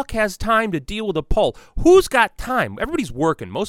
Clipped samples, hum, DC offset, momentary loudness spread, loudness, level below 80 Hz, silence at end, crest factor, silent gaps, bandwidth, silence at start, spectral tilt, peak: under 0.1%; none; under 0.1%; 10 LU; -19 LUFS; -32 dBFS; 0 s; 18 dB; none; 16 kHz; 0 s; -5 dB/octave; -2 dBFS